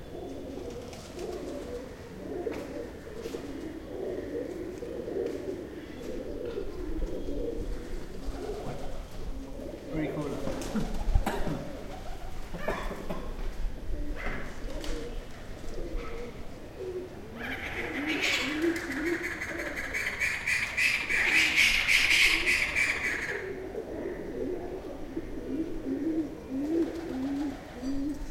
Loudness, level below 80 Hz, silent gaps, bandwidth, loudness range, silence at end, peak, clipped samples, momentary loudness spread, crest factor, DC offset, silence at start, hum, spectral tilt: -31 LUFS; -40 dBFS; none; 16.5 kHz; 15 LU; 0 s; -8 dBFS; under 0.1%; 17 LU; 24 dB; under 0.1%; 0 s; none; -3.5 dB/octave